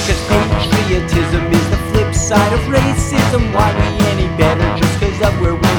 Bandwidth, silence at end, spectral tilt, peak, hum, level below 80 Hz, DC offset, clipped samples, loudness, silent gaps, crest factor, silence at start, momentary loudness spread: 18.5 kHz; 0 s; -5.5 dB/octave; 0 dBFS; none; -22 dBFS; under 0.1%; under 0.1%; -14 LUFS; none; 14 dB; 0 s; 2 LU